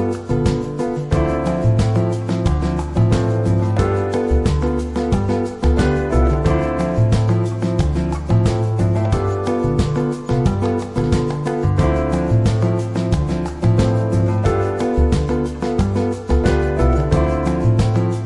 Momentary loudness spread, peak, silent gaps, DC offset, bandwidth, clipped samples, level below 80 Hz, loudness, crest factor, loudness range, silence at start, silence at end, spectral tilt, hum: 4 LU; -2 dBFS; none; under 0.1%; 11 kHz; under 0.1%; -24 dBFS; -18 LUFS; 14 dB; 1 LU; 0 s; 0 s; -8 dB/octave; none